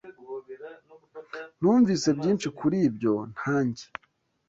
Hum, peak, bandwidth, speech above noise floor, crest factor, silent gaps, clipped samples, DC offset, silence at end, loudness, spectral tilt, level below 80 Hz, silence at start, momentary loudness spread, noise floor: none; -12 dBFS; 8 kHz; 25 dB; 16 dB; none; under 0.1%; under 0.1%; 0.65 s; -25 LUFS; -6 dB/octave; -64 dBFS; 0.05 s; 22 LU; -49 dBFS